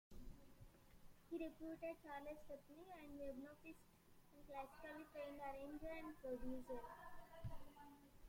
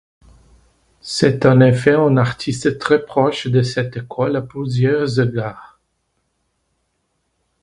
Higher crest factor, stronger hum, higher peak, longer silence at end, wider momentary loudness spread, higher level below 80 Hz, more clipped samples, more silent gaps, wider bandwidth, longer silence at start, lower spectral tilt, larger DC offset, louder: about the same, 16 dB vs 18 dB; neither; second, -38 dBFS vs 0 dBFS; second, 0 s vs 1.95 s; about the same, 13 LU vs 12 LU; second, -66 dBFS vs -50 dBFS; neither; neither; first, 16.5 kHz vs 11.5 kHz; second, 0.1 s vs 1.05 s; about the same, -6.5 dB/octave vs -6.5 dB/octave; neither; second, -55 LUFS vs -17 LUFS